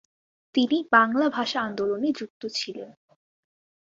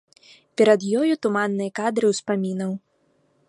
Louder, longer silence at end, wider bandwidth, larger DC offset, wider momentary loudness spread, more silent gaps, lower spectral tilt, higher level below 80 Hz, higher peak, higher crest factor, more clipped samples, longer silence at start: second, -25 LUFS vs -22 LUFS; first, 1.05 s vs 0.7 s; second, 7.8 kHz vs 11.5 kHz; neither; first, 14 LU vs 11 LU; first, 2.30-2.40 s vs none; second, -4 dB/octave vs -5.5 dB/octave; about the same, -72 dBFS vs -72 dBFS; about the same, -4 dBFS vs -4 dBFS; about the same, 22 dB vs 18 dB; neither; about the same, 0.55 s vs 0.6 s